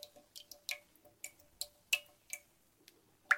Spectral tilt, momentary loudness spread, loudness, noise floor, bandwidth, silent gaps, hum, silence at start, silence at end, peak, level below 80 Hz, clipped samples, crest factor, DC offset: 2 dB/octave; 16 LU; -43 LUFS; -69 dBFS; 17 kHz; none; none; 0 s; 0 s; -16 dBFS; -82 dBFS; under 0.1%; 28 dB; under 0.1%